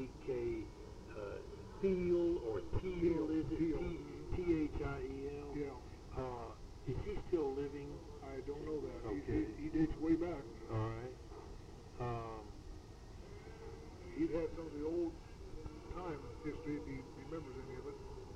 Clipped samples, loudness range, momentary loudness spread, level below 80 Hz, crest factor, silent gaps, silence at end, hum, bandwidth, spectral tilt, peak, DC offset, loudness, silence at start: under 0.1%; 8 LU; 16 LU; -52 dBFS; 18 dB; none; 0 s; none; 9.6 kHz; -8 dB/octave; -24 dBFS; under 0.1%; -42 LUFS; 0 s